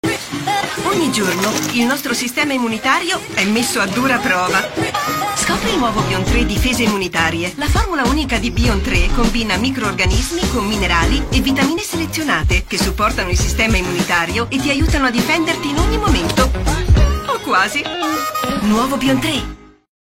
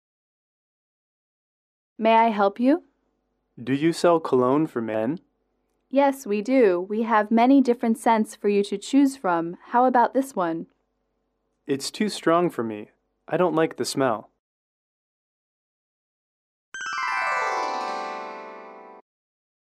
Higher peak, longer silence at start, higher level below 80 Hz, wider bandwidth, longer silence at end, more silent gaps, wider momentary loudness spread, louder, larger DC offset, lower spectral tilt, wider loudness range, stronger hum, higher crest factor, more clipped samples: first, 0 dBFS vs -8 dBFS; second, 0.05 s vs 2 s; first, -24 dBFS vs -74 dBFS; first, 16.5 kHz vs 14 kHz; second, 0.4 s vs 0.7 s; second, none vs 14.39-16.72 s; second, 4 LU vs 13 LU; first, -16 LUFS vs -23 LUFS; neither; second, -4 dB/octave vs -5.5 dB/octave; second, 1 LU vs 8 LU; neither; about the same, 16 dB vs 18 dB; neither